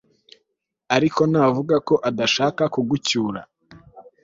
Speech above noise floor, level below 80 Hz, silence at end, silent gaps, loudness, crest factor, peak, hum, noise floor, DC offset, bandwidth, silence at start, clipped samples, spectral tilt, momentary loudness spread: 56 dB; -58 dBFS; 0.2 s; none; -20 LUFS; 18 dB; -4 dBFS; none; -76 dBFS; under 0.1%; 7.8 kHz; 0.9 s; under 0.1%; -5 dB/octave; 5 LU